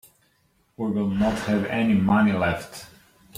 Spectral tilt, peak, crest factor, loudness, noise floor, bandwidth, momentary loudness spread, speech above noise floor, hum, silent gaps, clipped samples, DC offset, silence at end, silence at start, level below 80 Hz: -7 dB/octave; -8 dBFS; 16 dB; -23 LUFS; -65 dBFS; 15 kHz; 12 LU; 43 dB; none; none; under 0.1%; under 0.1%; 0.5 s; 0.8 s; -50 dBFS